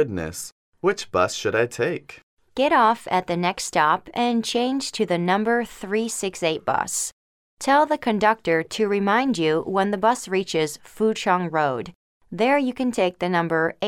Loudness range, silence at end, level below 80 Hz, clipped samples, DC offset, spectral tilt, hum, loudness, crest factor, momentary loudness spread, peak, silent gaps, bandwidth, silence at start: 2 LU; 0 s; -58 dBFS; under 0.1%; under 0.1%; -4 dB/octave; none; -22 LUFS; 18 dB; 7 LU; -4 dBFS; 0.52-0.72 s, 2.23-2.37 s, 7.12-7.57 s, 11.95-12.20 s; 17 kHz; 0 s